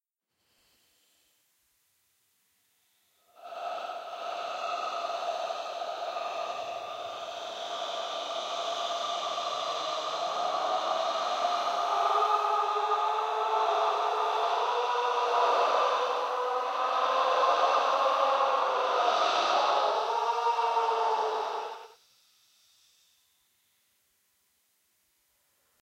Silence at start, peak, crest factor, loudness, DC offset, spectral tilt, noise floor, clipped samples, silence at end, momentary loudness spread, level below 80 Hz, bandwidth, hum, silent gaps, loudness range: 3.4 s; -12 dBFS; 18 dB; -29 LUFS; under 0.1%; 0 dB/octave; -79 dBFS; under 0.1%; 3.95 s; 11 LU; -88 dBFS; 16 kHz; none; none; 11 LU